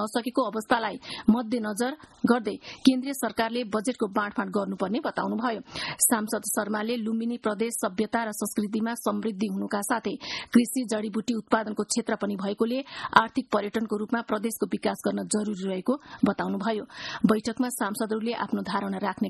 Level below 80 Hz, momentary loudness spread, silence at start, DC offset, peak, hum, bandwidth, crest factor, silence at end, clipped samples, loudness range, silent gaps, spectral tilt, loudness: -64 dBFS; 7 LU; 0 s; under 0.1%; 0 dBFS; none; 12.5 kHz; 26 dB; 0 s; under 0.1%; 2 LU; none; -4 dB/octave; -27 LUFS